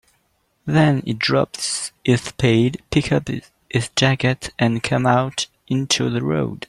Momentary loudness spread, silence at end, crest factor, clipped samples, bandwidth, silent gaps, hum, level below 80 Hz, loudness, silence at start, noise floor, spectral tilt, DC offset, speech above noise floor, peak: 7 LU; 0.1 s; 18 dB; under 0.1%; 12.5 kHz; none; none; -48 dBFS; -20 LUFS; 0.65 s; -66 dBFS; -5 dB/octave; under 0.1%; 46 dB; -2 dBFS